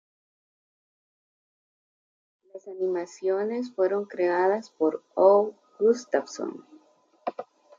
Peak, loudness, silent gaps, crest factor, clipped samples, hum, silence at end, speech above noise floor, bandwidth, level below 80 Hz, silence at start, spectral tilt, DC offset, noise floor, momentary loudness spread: -6 dBFS; -26 LUFS; none; 22 dB; under 0.1%; none; 0.35 s; 35 dB; 7.6 kHz; -82 dBFS; 2.55 s; -5.5 dB/octave; under 0.1%; -60 dBFS; 16 LU